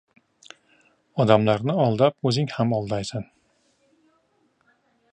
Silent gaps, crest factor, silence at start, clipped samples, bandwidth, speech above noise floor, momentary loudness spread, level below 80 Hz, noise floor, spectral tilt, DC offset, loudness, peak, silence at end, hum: none; 22 dB; 1.15 s; under 0.1%; 10 kHz; 45 dB; 14 LU; -60 dBFS; -66 dBFS; -7 dB/octave; under 0.1%; -22 LUFS; -2 dBFS; 1.9 s; none